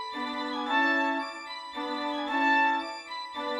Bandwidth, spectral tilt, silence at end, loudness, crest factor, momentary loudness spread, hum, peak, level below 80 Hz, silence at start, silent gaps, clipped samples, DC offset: 12 kHz; -2 dB/octave; 0 s; -28 LUFS; 16 dB; 13 LU; none; -14 dBFS; -74 dBFS; 0 s; none; under 0.1%; under 0.1%